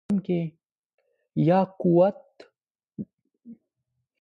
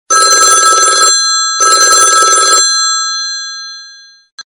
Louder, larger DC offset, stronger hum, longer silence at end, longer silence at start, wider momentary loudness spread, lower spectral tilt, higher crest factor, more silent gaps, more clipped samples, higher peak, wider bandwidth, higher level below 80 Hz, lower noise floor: second, -24 LUFS vs -6 LUFS; neither; neither; first, 0.65 s vs 0.05 s; about the same, 0.1 s vs 0.1 s; first, 20 LU vs 13 LU; first, -10.5 dB/octave vs 3 dB/octave; first, 18 dB vs 10 dB; first, 0.72-0.98 s, 2.70-2.75 s vs 4.32-4.38 s; second, under 0.1% vs 1%; second, -10 dBFS vs 0 dBFS; second, 5.2 kHz vs over 20 kHz; second, -68 dBFS vs -56 dBFS; first, -80 dBFS vs -36 dBFS